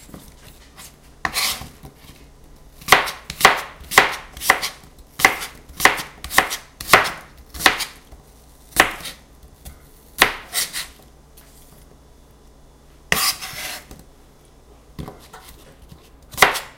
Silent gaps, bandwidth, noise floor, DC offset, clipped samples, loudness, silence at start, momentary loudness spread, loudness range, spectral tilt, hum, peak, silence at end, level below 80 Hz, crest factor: none; 17 kHz; -48 dBFS; under 0.1%; under 0.1%; -18 LUFS; 0.15 s; 22 LU; 9 LU; -1 dB/octave; none; 0 dBFS; 0.05 s; -44 dBFS; 24 dB